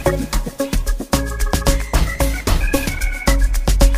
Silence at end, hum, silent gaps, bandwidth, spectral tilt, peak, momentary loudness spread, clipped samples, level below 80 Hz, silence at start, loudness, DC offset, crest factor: 0 s; none; none; 16 kHz; -4.5 dB/octave; 0 dBFS; 4 LU; under 0.1%; -18 dBFS; 0 s; -20 LUFS; under 0.1%; 16 dB